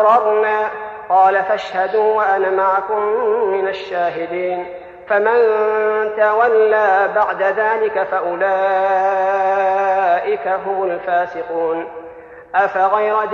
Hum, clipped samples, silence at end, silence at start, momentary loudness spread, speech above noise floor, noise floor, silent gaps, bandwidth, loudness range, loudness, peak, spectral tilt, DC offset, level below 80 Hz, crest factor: none; under 0.1%; 0 s; 0 s; 8 LU; 21 dB; -36 dBFS; none; 6.8 kHz; 3 LU; -16 LUFS; -2 dBFS; -5.5 dB/octave; under 0.1%; -60 dBFS; 14 dB